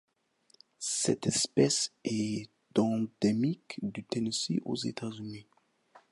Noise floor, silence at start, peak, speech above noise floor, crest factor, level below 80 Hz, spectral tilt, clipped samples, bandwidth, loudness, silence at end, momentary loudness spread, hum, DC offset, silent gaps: -68 dBFS; 0.8 s; -12 dBFS; 37 dB; 20 dB; -70 dBFS; -4 dB/octave; under 0.1%; 11.5 kHz; -31 LUFS; 0.15 s; 12 LU; none; under 0.1%; none